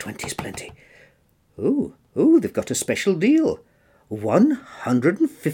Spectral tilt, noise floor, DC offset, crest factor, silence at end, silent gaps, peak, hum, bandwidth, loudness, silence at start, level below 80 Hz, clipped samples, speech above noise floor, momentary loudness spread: -5.5 dB/octave; -60 dBFS; under 0.1%; 18 dB; 0 s; none; -4 dBFS; none; 17 kHz; -21 LUFS; 0 s; -60 dBFS; under 0.1%; 40 dB; 15 LU